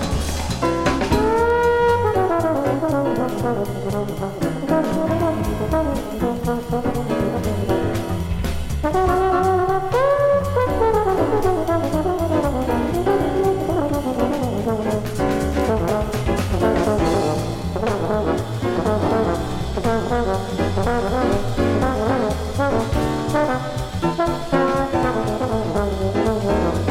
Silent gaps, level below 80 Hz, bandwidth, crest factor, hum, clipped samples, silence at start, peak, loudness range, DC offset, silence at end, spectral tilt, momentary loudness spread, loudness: none; -32 dBFS; 17 kHz; 16 dB; none; under 0.1%; 0 s; -4 dBFS; 3 LU; under 0.1%; 0 s; -6.5 dB/octave; 6 LU; -20 LUFS